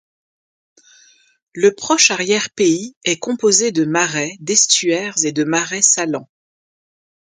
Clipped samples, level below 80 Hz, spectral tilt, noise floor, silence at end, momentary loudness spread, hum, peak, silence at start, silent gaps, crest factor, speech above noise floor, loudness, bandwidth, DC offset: under 0.1%; -66 dBFS; -2 dB/octave; -52 dBFS; 1.15 s; 8 LU; none; 0 dBFS; 1.55 s; 2.96-3.01 s; 18 dB; 35 dB; -15 LUFS; 10.5 kHz; under 0.1%